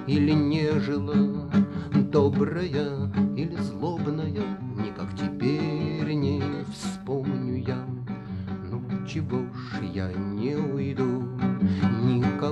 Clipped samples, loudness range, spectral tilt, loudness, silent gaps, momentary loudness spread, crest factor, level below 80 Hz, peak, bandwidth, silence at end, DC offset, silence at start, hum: under 0.1%; 6 LU; -8 dB/octave; -27 LUFS; none; 9 LU; 18 dB; -54 dBFS; -8 dBFS; 10 kHz; 0 s; under 0.1%; 0 s; none